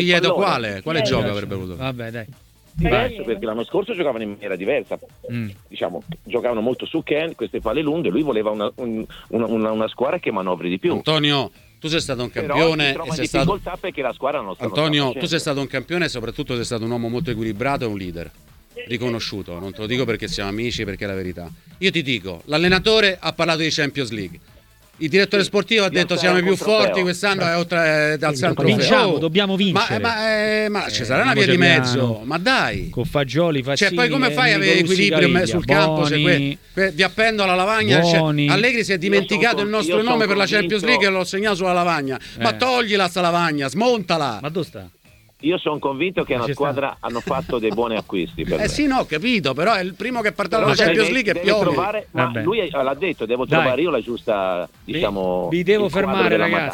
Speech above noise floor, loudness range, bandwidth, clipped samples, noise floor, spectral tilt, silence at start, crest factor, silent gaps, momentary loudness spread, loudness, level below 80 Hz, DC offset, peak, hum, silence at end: 30 dB; 7 LU; 18 kHz; under 0.1%; -50 dBFS; -5 dB/octave; 0 s; 20 dB; none; 11 LU; -19 LUFS; -44 dBFS; under 0.1%; 0 dBFS; none; 0 s